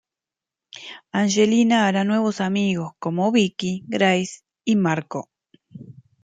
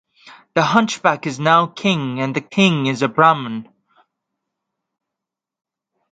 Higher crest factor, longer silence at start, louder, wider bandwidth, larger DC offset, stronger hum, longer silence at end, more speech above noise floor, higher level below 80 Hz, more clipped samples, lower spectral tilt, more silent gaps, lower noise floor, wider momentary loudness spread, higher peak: about the same, 18 dB vs 20 dB; first, 0.75 s vs 0.25 s; second, -21 LUFS vs -17 LUFS; about the same, 9.2 kHz vs 9.2 kHz; neither; neither; second, 0.3 s vs 2.5 s; about the same, 68 dB vs 68 dB; about the same, -66 dBFS vs -62 dBFS; neither; about the same, -5 dB/octave vs -5 dB/octave; neither; about the same, -88 dBFS vs -85 dBFS; first, 15 LU vs 8 LU; second, -4 dBFS vs 0 dBFS